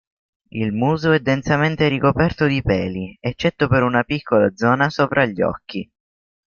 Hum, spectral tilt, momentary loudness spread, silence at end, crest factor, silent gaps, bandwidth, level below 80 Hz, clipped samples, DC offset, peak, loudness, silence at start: none; -7 dB/octave; 9 LU; 0.6 s; 18 dB; none; 7 kHz; -44 dBFS; under 0.1%; under 0.1%; -2 dBFS; -19 LUFS; 0.55 s